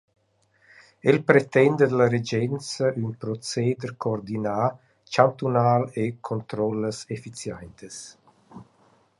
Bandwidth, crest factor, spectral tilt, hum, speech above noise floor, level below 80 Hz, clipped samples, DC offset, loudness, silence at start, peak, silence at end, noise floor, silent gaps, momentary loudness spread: 11.5 kHz; 24 dB; -6 dB/octave; none; 41 dB; -62 dBFS; under 0.1%; under 0.1%; -24 LUFS; 1.05 s; -2 dBFS; 0.55 s; -65 dBFS; none; 16 LU